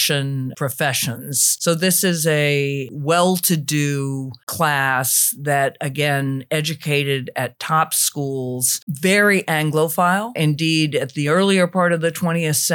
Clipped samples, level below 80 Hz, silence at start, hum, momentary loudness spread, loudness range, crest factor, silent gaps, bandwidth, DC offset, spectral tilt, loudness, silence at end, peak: under 0.1%; -70 dBFS; 0 s; none; 8 LU; 2 LU; 16 dB; 4.43-4.47 s, 8.82-8.87 s; 19 kHz; under 0.1%; -3.5 dB/octave; -18 LUFS; 0 s; -4 dBFS